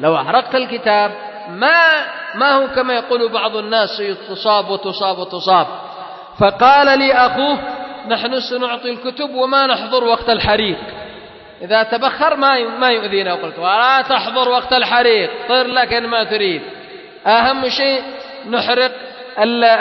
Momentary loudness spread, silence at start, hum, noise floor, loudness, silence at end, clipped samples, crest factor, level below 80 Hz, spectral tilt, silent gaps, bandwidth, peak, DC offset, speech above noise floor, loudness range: 14 LU; 0 s; none; -37 dBFS; -15 LUFS; 0 s; under 0.1%; 16 dB; -48 dBFS; -5 dB/octave; none; 6 kHz; 0 dBFS; under 0.1%; 22 dB; 3 LU